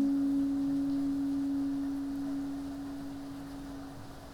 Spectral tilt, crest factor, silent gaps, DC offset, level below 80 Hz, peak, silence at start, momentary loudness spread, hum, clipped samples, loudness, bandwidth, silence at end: -6.5 dB/octave; 12 dB; none; under 0.1%; -56 dBFS; -22 dBFS; 0 s; 13 LU; none; under 0.1%; -34 LUFS; 13 kHz; 0 s